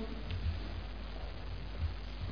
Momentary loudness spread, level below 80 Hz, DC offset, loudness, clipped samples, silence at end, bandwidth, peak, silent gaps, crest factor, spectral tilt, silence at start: 6 LU; -42 dBFS; 0.4%; -42 LUFS; under 0.1%; 0 s; 5.4 kHz; -26 dBFS; none; 14 dB; -5.5 dB/octave; 0 s